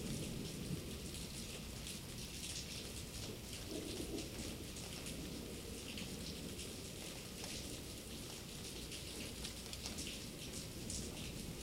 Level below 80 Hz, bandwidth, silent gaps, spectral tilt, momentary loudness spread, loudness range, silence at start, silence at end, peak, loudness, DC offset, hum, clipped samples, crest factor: -56 dBFS; 16 kHz; none; -3.5 dB/octave; 3 LU; 1 LU; 0 s; 0 s; -26 dBFS; -46 LUFS; under 0.1%; none; under 0.1%; 22 dB